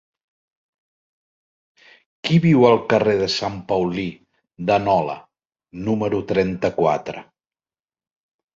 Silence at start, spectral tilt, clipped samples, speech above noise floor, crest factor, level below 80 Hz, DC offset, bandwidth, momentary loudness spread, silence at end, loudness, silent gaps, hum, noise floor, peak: 2.25 s; -6.5 dB/octave; under 0.1%; over 71 dB; 20 dB; -52 dBFS; under 0.1%; 7.6 kHz; 15 LU; 1.35 s; -20 LUFS; none; none; under -90 dBFS; -2 dBFS